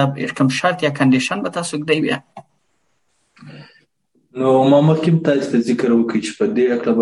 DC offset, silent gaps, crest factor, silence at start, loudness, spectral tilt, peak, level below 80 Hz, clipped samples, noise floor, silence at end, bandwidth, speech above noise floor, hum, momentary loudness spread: under 0.1%; none; 16 dB; 0 s; -17 LUFS; -6 dB/octave; -2 dBFS; -64 dBFS; under 0.1%; -68 dBFS; 0 s; 11.5 kHz; 52 dB; none; 9 LU